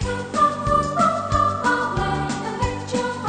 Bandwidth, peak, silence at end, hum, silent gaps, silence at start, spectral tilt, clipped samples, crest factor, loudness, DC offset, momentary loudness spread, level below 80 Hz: 9.4 kHz; -6 dBFS; 0 s; none; none; 0 s; -5 dB/octave; under 0.1%; 14 dB; -21 LUFS; under 0.1%; 6 LU; -36 dBFS